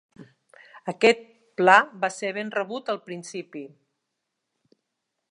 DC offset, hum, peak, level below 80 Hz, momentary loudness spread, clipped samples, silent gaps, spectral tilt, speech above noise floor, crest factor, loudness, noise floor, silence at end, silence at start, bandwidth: under 0.1%; none; -2 dBFS; -82 dBFS; 20 LU; under 0.1%; none; -4 dB/octave; 58 dB; 24 dB; -22 LUFS; -81 dBFS; 1.65 s; 0.2 s; 11 kHz